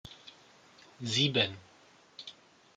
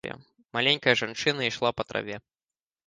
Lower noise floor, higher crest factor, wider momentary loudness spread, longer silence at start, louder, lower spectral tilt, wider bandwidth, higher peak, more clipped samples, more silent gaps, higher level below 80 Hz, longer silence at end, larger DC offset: second, -61 dBFS vs under -90 dBFS; about the same, 24 dB vs 24 dB; first, 25 LU vs 17 LU; about the same, 0.05 s vs 0.05 s; second, -30 LUFS vs -26 LUFS; about the same, -4 dB/octave vs -3.5 dB/octave; about the same, 9.6 kHz vs 10 kHz; second, -12 dBFS vs -4 dBFS; neither; neither; second, -72 dBFS vs -64 dBFS; second, 0.45 s vs 0.7 s; neither